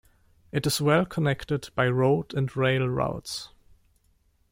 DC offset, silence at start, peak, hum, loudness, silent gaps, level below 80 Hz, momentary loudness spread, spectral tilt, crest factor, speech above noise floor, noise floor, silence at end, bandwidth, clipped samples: under 0.1%; 0.55 s; -8 dBFS; none; -26 LUFS; none; -54 dBFS; 11 LU; -5.5 dB/octave; 18 dB; 41 dB; -66 dBFS; 1.05 s; 16.5 kHz; under 0.1%